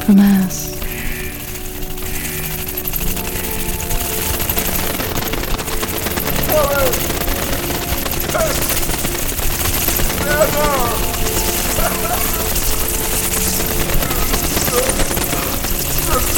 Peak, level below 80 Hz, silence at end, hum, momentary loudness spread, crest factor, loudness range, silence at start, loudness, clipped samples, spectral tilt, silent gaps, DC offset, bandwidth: 0 dBFS; -24 dBFS; 0 s; none; 7 LU; 16 dB; 4 LU; 0 s; -17 LUFS; under 0.1%; -3.5 dB/octave; none; under 0.1%; 18 kHz